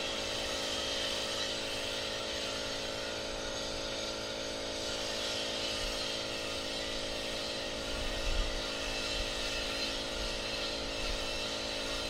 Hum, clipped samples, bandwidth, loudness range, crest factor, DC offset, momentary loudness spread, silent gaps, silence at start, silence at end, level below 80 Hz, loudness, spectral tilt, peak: none; under 0.1%; 16 kHz; 1 LU; 16 dB; under 0.1%; 3 LU; none; 0 s; 0 s; -46 dBFS; -35 LUFS; -2 dB/octave; -20 dBFS